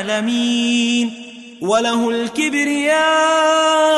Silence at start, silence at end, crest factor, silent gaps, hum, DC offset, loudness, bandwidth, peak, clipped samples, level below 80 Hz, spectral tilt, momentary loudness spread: 0 s; 0 s; 12 dB; none; none; under 0.1%; -16 LUFS; 12 kHz; -4 dBFS; under 0.1%; -64 dBFS; -2.5 dB/octave; 8 LU